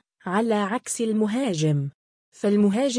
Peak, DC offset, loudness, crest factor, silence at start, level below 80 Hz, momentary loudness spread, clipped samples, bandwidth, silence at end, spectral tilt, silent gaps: -10 dBFS; under 0.1%; -24 LUFS; 14 dB; 0.25 s; -70 dBFS; 7 LU; under 0.1%; 10.5 kHz; 0 s; -5.5 dB/octave; 1.94-2.32 s